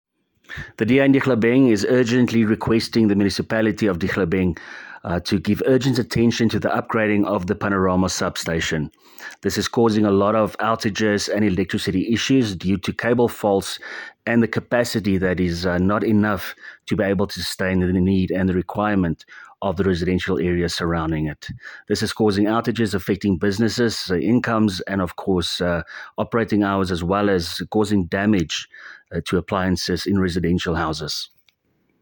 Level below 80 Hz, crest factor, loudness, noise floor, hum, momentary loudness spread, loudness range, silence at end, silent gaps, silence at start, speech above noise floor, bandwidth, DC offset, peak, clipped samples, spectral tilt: -48 dBFS; 16 dB; -20 LUFS; -66 dBFS; none; 9 LU; 3 LU; 0.75 s; none; 0.5 s; 46 dB; 17.5 kHz; under 0.1%; -4 dBFS; under 0.1%; -5.5 dB/octave